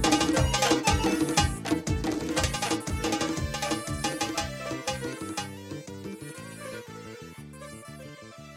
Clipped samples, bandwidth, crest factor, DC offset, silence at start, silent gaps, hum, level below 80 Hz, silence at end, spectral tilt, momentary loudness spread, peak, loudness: under 0.1%; 16.5 kHz; 22 dB; under 0.1%; 0 s; none; none; -40 dBFS; 0 s; -4 dB/octave; 19 LU; -8 dBFS; -28 LUFS